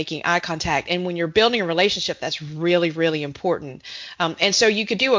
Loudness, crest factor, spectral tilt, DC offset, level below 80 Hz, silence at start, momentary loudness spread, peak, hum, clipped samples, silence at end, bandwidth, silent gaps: -21 LUFS; 20 dB; -3.5 dB/octave; under 0.1%; -52 dBFS; 0 s; 9 LU; -2 dBFS; none; under 0.1%; 0 s; 7.6 kHz; none